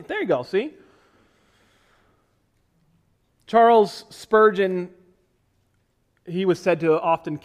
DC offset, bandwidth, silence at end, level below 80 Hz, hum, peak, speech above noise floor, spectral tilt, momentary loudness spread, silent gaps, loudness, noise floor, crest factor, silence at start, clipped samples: under 0.1%; 12.5 kHz; 0.05 s; -66 dBFS; none; -6 dBFS; 47 dB; -6.5 dB/octave; 15 LU; none; -20 LUFS; -67 dBFS; 18 dB; 0 s; under 0.1%